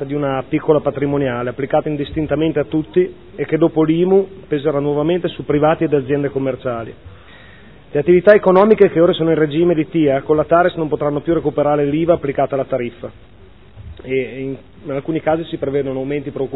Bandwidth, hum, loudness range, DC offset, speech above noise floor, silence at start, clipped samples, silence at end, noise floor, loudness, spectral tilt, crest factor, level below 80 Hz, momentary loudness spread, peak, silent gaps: 4.3 kHz; none; 9 LU; 0.5%; 27 dB; 0 s; under 0.1%; 0 s; -43 dBFS; -17 LUFS; -11 dB/octave; 16 dB; -44 dBFS; 12 LU; 0 dBFS; none